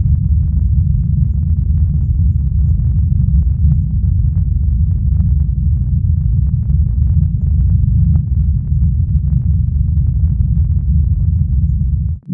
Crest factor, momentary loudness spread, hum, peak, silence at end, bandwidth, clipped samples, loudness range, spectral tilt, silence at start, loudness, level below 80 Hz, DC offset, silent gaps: 10 dB; 2 LU; none; -2 dBFS; 0 s; 0.9 kHz; under 0.1%; 1 LU; -14.5 dB/octave; 0 s; -15 LUFS; -16 dBFS; under 0.1%; none